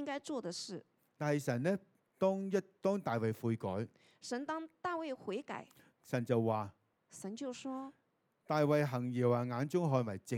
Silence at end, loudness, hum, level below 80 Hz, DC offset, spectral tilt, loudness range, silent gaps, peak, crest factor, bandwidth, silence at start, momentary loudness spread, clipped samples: 0 s; -37 LUFS; none; -84 dBFS; under 0.1%; -6.5 dB/octave; 4 LU; none; -18 dBFS; 18 dB; 17.5 kHz; 0 s; 14 LU; under 0.1%